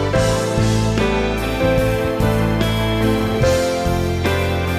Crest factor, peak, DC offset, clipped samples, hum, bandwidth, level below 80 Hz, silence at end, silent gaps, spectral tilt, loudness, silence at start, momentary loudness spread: 12 dB; -6 dBFS; under 0.1%; under 0.1%; none; 16 kHz; -28 dBFS; 0 s; none; -6 dB/octave; -18 LUFS; 0 s; 2 LU